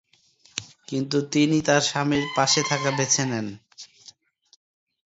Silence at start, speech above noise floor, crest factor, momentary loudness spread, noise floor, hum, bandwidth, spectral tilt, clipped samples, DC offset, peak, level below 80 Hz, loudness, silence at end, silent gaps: 0.55 s; 37 dB; 20 dB; 19 LU; -59 dBFS; none; 8 kHz; -3.5 dB/octave; under 0.1%; under 0.1%; -6 dBFS; -62 dBFS; -22 LUFS; 1.2 s; none